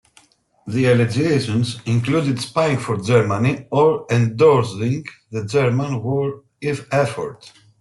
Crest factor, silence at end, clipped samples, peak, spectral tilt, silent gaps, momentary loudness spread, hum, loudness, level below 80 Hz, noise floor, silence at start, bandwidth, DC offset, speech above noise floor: 16 dB; 0.3 s; under 0.1%; -4 dBFS; -6.5 dB/octave; none; 11 LU; none; -19 LUFS; -56 dBFS; -55 dBFS; 0.65 s; 12 kHz; under 0.1%; 37 dB